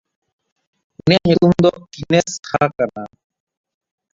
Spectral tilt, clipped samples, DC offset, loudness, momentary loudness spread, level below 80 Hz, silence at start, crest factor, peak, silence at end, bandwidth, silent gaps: -6 dB/octave; under 0.1%; under 0.1%; -16 LUFS; 17 LU; -50 dBFS; 1.05 s; 18 dB; 0 dBFS; 1.05 s; 7.8 kHz; none